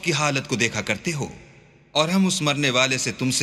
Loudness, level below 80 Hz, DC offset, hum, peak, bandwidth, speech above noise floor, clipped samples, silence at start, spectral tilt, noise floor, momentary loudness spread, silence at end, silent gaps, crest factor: -22 LUFS; -56 dBFS; under 0.1%; none; -2 dBFS; 14 kHz; 29 dB; under 0.1%; 0 s; -3.5 dB/octave; -51 dBFS; 7 LU; 0 s; none; 20 dB